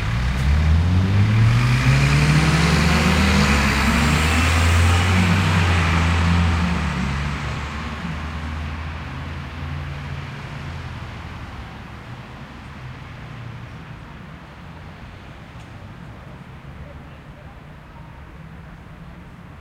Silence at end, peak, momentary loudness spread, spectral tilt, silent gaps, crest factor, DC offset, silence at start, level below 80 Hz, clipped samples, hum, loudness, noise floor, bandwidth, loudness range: 0 s; -4 dBFS; 23 LU; -5.5 dB/octave; none; 16 dB; under 0.1%; 0 s; -28 dBFS; under 0.1%; none; -19 LUFS; -40 dBFS; 16 kHz; 22 LU